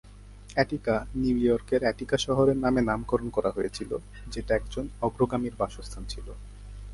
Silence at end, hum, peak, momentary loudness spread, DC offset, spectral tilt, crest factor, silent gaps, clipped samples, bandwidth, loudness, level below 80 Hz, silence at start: 0 s; 50 Hz at -45 dBFS; -10 dBFS; 15 LU; under 0.1%; -6 dB/octave; 18 dB; none; under 0.1%; 11.5 kHz; -28 LUFS; -42 dBFS; 0.05 s